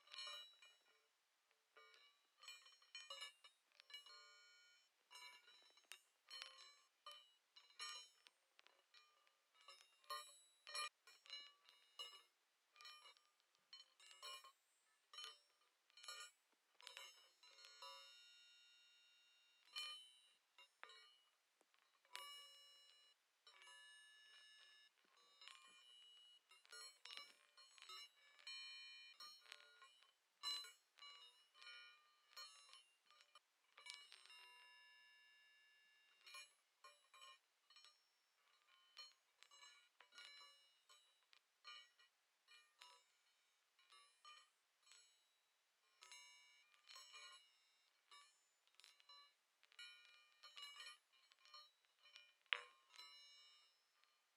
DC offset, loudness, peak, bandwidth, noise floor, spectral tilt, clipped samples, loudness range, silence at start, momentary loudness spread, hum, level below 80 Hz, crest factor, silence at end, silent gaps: under 0.1%; -59 LUFS; -18 dBFS; 14 kHz; -85 dBFS; 4 dB/octave; under 0.1%; 11 LU; 0 s; 15 LU; none; under -90 dBFS; 46 dB; 0 s; none